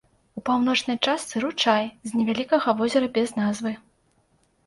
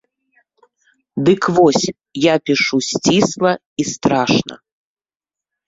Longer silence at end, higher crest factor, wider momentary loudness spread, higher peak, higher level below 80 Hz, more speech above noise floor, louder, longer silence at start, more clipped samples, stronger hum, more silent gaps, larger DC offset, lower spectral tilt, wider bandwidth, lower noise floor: second, 0.9 s vs 1.1 s; about the same, 20 dB vs 18 dB; about the same, 9 LU vs 9 LU; second, -4 dBFS vs 0 dBFS; second, -64 dBFS vs -54 dBFS; second, 42 dB vs over 74 dB; second, -24 LUFS vs -16 LUFS; second, 0.35 s vs 1.15 s; neither; neither; second, none vs 3.66-3.76 s; neither; about the same, -4 dB/octave vs -4.5 dB/octave; first, 11.5 kHz vs 7.8 kHz; second, -65 dBFS vs under -90 dBFS